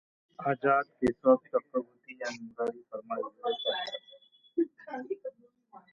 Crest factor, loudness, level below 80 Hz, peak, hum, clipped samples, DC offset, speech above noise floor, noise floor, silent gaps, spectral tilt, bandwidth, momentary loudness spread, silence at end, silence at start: 22 dB; -32 LUFS; -68 dBFS; -10 dBFS; none; under 0.1%; under 0.1%; 27 dB; -59 dBFS; none; -5.5 dB/octave; 7.6 kHz; 14 LU; 0.15 s; 0.4 s